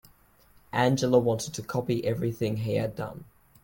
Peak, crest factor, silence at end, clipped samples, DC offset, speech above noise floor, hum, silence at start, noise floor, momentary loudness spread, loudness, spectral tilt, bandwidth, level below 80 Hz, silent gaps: -8 dBFS; 20 dB; 0.4 s; under 0.1%; under 0.1%; 33 dB; none; 0.75 s; -59 dBFS; 11 LU; -28 LUFS; -6 dB/octave; 17 kHz; -58 dBFS; none